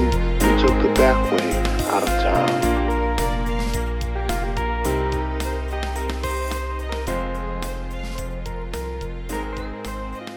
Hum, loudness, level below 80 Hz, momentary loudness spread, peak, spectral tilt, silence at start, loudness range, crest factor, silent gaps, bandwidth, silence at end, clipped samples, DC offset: none; -23 LUFS; -26 dBFS; 13 LU; -4 dBFS; -5.5 dB/octave; 0 s; 10 LU; 16 dB; none; 19.5 kHz; 0 s; under 0.1%; 0.1%